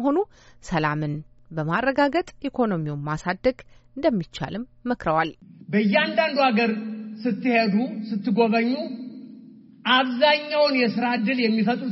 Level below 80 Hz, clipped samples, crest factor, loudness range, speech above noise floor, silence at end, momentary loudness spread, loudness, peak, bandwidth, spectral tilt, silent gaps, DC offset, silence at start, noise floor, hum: -54 dBFS; under 0.1%; 18 dB; 4 LU; 24 dB; 0 s; 12 LU; -23 LUFS; -6 dBFS; 7.6 kHz; -3.5 dB/octave; none; under 0.1%; 0 s; -47 dBFS; none